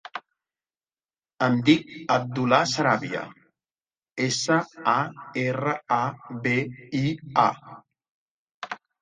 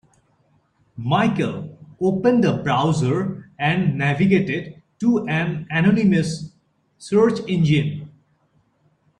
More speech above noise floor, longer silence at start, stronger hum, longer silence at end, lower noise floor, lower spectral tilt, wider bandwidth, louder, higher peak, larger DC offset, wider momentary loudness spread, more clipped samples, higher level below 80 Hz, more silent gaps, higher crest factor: first, over 66 dB vs 44 dB; second, 0.15 s vs 0.95 s; neither; second, 0.25 s vs 1.1 s; first, under -90 dBFS vs -63 dBFS; second, -5 dB/octave vs -7 dB/octave; about the same, 9.8 kHz vs 10.5 kHz; second, -24 LUFS vs -20 LUFS; about the same, -4 dBFS vs -4 dBFS; neither; about the same, 16 LU vs 14 LU; neither; second, -64 dBFS vs -54 dBFS; first, 8.11-8.61 s vs none; about the same, 22 dB vs 18 dB